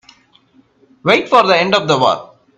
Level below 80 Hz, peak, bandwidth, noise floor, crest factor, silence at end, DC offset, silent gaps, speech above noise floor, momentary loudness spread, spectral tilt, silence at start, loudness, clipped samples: -58 dBFS; 0 dBFS; 9.8 kHz; -52 dBFS; 16 dB; 0.35 s; under 0.1%; none; 40 dB; 8 LU; -4.5 dB/octave; 1.05 s; -13 LUFS; under 0.1%